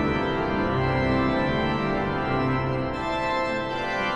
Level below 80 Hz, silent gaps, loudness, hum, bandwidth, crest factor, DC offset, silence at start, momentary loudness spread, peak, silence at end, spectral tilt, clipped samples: -40 dBFS; none; -25 LUFS; none; 8.8 kHz; 14 dB; under 0.1%; 0 s; 4 LU; -12 dBFS; 0 s; -7 dB/octave; under 0.1%